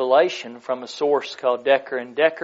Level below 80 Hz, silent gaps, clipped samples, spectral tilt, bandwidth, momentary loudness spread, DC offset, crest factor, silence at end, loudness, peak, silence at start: -78 dBFS; none; under 0.1%; -1 dB/octave; 7.8 kHz; 11 LU; under 0.1%; 16 dB; 0 s; -22 LUFS; -4 dBFS; 0 s